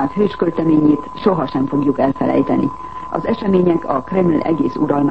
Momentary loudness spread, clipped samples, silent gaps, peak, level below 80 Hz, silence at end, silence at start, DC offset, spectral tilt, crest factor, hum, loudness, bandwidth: 6 LU; under 0.1%; none; -2 dBFS; -46 dBFS; 0 s; 0 s; 1%; -9.5 dB/octave; 14 dB; none; -17 LUFS; 6 kHz